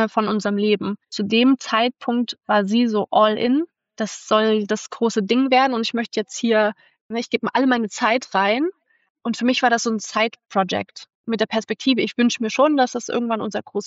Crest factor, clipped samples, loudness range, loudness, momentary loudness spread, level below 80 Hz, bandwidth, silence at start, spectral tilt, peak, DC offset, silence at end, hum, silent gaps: 16 dB; under 0.1%; 2 LU; -20 LUFS; 10 LU; -70 dBFS; 8 kHz; 0 s; -4 dB/octave; -4 dBFS; under 0.1%; 0 s; none; 7.01-7.09 s, 9.10-9.15 s, 11.15-11.24 s